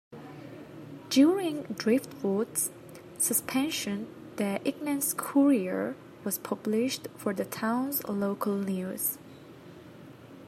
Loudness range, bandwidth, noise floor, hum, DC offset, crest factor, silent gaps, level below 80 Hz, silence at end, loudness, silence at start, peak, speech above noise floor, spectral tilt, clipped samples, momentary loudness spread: 3 LU; 16 kHz; -49 dBFS; none; under 0.1%; 18 dB; none; -74 dBFS; 0 s; -29 LUFS; 0.1 s; -12 dBFS; 20 dB; -4 dB/octave; under 0.1%; 23 LU